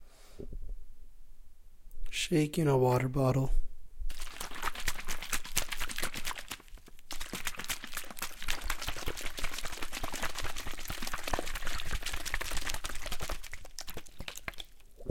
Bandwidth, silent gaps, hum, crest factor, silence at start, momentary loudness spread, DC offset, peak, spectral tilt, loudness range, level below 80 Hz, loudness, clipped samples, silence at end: 17 kHz; none; none; 24 dB; 0 s; 17 LU; under 0.1%; -8 dBFS; -4 dB/octave; 7 LU; -40 dBFS; -36 LUFS; under 0.1%; 0 s